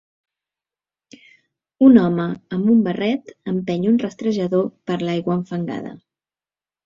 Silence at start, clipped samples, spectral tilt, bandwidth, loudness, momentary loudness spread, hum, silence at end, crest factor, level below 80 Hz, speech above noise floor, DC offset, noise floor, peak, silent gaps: 1.8 s; under 0.1%; -8 dB/octave; 7.2 kHz; -19 LUFS; 13 LU; none; 0.9 s; 18 dB; -60 dBFS; over 72 dB; under 0.1%; under -90 dBFS; -2 dBFS; none